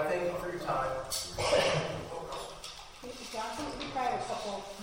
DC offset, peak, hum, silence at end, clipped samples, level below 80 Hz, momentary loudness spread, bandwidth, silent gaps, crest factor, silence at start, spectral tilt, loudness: under 0.1%; -16 dBFS; none; 0 s; under 0.1%; -54 dBFS; 15 LU; 16 kHz; none; 18 dB; 0 s; -3.5 dB/octave; -34 LUFS